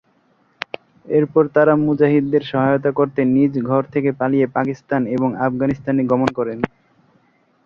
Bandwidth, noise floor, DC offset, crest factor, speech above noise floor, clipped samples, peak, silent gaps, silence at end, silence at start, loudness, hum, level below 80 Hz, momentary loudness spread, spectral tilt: 7 kHz; -59 dBFS; under 0.1%; 18 dB; 42 dB; under 0.1%; 0 dBFS; none; 1 s; 1.05 s; -18 LUFS; none; -56 dBFS; 10 LU; -9 dB/octave